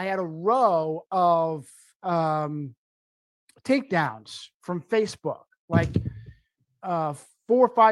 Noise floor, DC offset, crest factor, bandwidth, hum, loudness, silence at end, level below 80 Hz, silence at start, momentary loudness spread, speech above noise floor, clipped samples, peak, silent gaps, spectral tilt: -64 dBFS; under 0.1%; 20 dB; 12 kHz; none; -25 LUFS; 0 s; -54 dBFS; 0 s; 17 LU; 40 dB; under 0.1%; -6 dBFS; 1.95-2.00 s, 2.77-3.48 s, 4.54-4.60 s, 5.57-5.68 s; -7 dB/octave